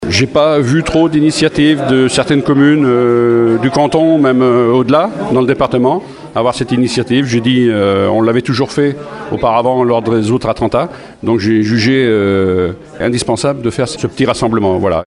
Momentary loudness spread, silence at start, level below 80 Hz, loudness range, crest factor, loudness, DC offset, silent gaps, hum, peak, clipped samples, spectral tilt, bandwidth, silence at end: 6 LU; 0 s; -40 dBFS; 3 LU; 12 dB; -12 LUFS; under 0.1%; none; none; 0 dBFS; under 0.1%; -6 dB/octave; 11 kHz; 0.05 s